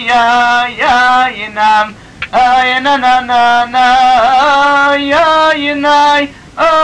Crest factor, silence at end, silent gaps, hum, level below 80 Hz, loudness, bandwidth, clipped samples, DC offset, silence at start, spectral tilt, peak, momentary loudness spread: 8 dB; 0 s; none; none; -42 dBFS; -9 LUFS; 10 kHz; under 0.1%; 0.5%; 0 s; -3 dB/octave; -2 dBFS; 5 LU